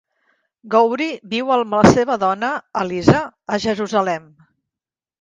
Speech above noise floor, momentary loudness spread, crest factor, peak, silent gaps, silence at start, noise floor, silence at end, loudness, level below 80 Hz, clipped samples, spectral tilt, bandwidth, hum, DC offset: 72 dB; 10 LU; 18 dB; 0 dBFS; none; 0.65 s; -89 dBFS; 1 s; -18 LUFS; -46 dBFS; under 0.1%; -6 dB/octave; 10 kHz; none; under 0.1%